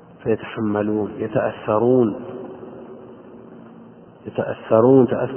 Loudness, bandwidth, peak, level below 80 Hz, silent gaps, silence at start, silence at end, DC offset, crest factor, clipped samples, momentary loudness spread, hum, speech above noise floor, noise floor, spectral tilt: -19 LUFS; 3.3 kHz; -2 dBFS; -56 dBFS; none; 0.2 s; 0 s; under 0.1%; 18 dB; under 0.1%; 24 LU; none; 25 dB; -44 dBFS; -12 dB/octave